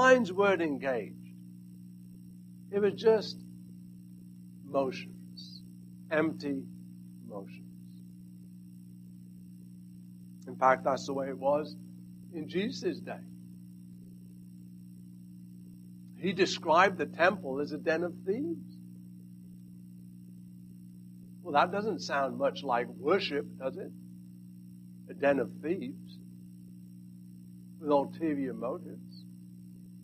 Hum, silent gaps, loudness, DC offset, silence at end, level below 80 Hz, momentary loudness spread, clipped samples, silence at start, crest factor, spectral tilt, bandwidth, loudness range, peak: 60 Hz at -45 dBFS; none; -31 LUFS; under 0.1%; 0 s; -74 dBFS; 23 LU; under 0.1%; 0 s; 24 dB; -5.5 dB/octave; 14.5 kHz; 12 LU; -10 dBFS